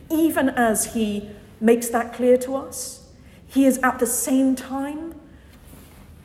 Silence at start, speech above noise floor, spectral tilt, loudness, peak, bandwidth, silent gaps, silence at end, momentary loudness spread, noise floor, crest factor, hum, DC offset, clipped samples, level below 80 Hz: 0 s; 26 dB; -4 dB/octave; -21 LUFS; -4 dBFS; 16.5 kHz; none; 0.1 s; 13 LU; -46 dBFS; 18 dB; none; under 0.1%; under 0.1%; -52 dBFS